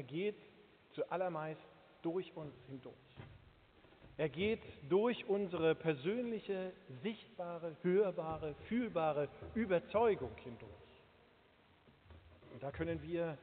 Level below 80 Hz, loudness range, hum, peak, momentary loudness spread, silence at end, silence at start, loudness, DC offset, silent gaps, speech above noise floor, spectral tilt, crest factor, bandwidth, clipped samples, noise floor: -68 dBFS; 8 LU; none; -22 dBFS; 19 LU; 0 s; 0 s; -39 LUFS; under 0.1%; none; 29 dB; -5.5 dB/octave; 18 dB; 4.6 kHz; under 0.1%; -68 dBFS